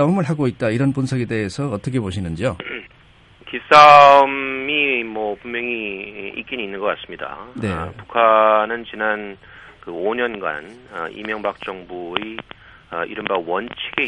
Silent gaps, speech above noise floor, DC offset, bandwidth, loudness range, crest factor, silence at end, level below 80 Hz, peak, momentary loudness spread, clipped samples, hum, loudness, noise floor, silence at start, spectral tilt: none; 31 dB; under 0.1%; 11 kHz; 12 LU; 18 dB; 0 s; -50 dBFS; 0 dBFS; 18 LU; under 0.1%; none; -17 LUFS; -49 dBFS; 0 s; -6 dB/octave